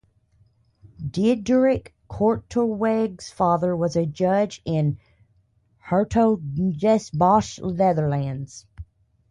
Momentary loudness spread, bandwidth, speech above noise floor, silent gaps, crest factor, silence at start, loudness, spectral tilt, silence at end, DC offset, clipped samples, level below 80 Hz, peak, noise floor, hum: 11 LU; 11 kHz; 42 dB; none; 16 dB; 1 s; -22 LUFS; -7.5 dB/octave; 0.5 s; under 0.1%; under 0.1%; -48 dBFS; -6 dBFS; -63 dBFS; none